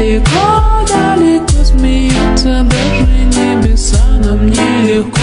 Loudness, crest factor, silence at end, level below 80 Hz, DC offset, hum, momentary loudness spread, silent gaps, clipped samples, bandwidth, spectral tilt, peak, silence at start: -10 LUFS; 8 dB; 0 s; -12 dBFS; under 0.1%; none; 2 LU; none; under 0.1%; 11 kHz; -5.5 dB/octave; 0 dBFS; 0 s